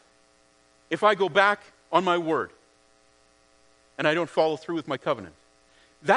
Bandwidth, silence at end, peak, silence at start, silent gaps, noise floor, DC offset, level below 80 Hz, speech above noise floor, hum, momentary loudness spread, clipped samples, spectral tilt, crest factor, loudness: 10.5 kHz; 0 s; -4 dBFS; 0.9 s; none; -61 dBFS; under 0.1%; -72 dBFS; 37 dB; none; 13 LU; under 0.1%; -5 dB/octave; 22 dB; -25 LUFS